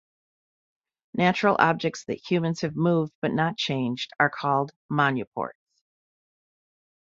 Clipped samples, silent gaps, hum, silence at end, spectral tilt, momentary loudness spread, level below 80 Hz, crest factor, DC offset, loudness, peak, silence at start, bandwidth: under 0.1%; 3.15-3.22 s, 4.76-4.89 s, 5.27-5.32 s; none; 1.6 s; -6 dB/octave; 10 LU; -66 dBFS; 22 dB; under 0.1%; -25 LUFS; -4 dBFS; 1.15 s; 7.8 kHz